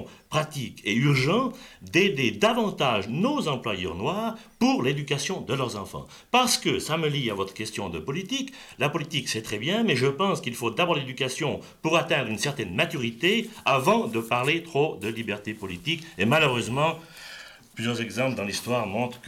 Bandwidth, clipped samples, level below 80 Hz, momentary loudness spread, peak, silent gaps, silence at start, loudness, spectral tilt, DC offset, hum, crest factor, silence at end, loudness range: 16.5 kHz; under 0.1%; -60 dBFS; 10 LU; -10 dBFS; none; 0 s; -26 LUFS; -4.5 dB/octave; under 0.1%; none; 18 dB; 0 s; 3 LU